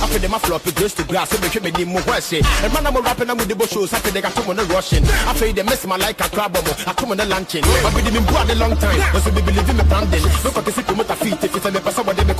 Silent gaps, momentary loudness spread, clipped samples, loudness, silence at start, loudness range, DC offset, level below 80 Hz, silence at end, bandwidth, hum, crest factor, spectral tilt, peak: none; 4 LU; under 0.1%; -18 LUFS; 0 s; 2 LU; under 0.1%; -22 dBFS; 0 s; 15 kHz; none; 16 dB; -4.5 dB/octave; -2 dBFS